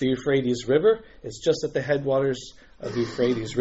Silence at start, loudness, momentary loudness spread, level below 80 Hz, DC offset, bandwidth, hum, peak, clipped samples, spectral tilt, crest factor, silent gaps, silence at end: 0 s; -24 LUFS; 13 LU; -54 dBFS; under 0.1%; 8 kHz; none; -8 dBFS; under 0.1%; -5.5 dB/octave; 16 dB; none; 0 s